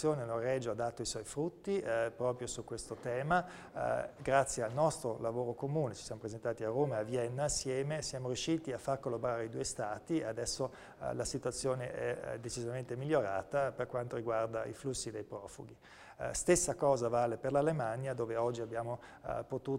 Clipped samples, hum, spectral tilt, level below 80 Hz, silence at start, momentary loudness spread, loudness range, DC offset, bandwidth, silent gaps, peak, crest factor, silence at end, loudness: under 0.1%; none; -4.5 dB/octave; -60 dBFS; 0 s; 10 LU; 4 LU; under 0.1%; 16 kHz; none; -14 dBFS; 22 dB; 0 s; -37 LUFS